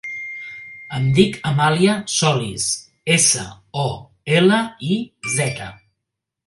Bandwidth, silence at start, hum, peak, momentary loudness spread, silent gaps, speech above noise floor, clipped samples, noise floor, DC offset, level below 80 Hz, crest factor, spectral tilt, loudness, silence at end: 11.5 kHz; 0.05 s; none; 0 dBFS; 16 LU; none; 62 dB; under 0.1%; -81 dBFS; under 0.1%; -52 dBFS; 20 dB; -4 dB/octave; -18 LUFS; 0.75 s